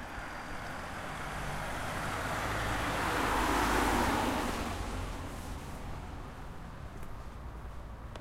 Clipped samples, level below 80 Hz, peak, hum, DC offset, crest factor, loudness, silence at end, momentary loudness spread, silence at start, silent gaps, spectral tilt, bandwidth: under 0.1%; -44 dBFS; -18 dBFS; none; under 0.1%; 18 dB; -34 LUFS; 0 s; 17 LU; 0 s; none; -4.5 dB/octave; 16 kHz